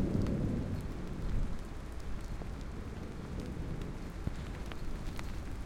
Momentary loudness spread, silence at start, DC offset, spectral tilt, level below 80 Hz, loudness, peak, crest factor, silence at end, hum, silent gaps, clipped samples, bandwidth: 9 LU; 0 s; under 0.1%; -7 dB/octave; -42 dBFS; -41 LUFS; -20 dBFS; 16 dB; 0 s; none; none; under 0.1%; 16 kHz